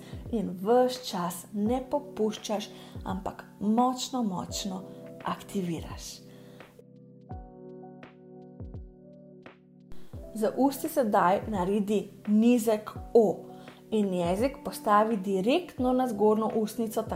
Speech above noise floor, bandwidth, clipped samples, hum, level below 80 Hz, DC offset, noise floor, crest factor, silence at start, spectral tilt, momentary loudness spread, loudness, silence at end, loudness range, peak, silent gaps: 25 dB; 16 kHz; under 0.1%; none; -52 dBFS; under 0.1%; -52 dBFS; 20 dB; 0 s; -5.5 dB/octave; 21 LU; -28 LUFS; 0 s; 19 LU; -10 dBFS; none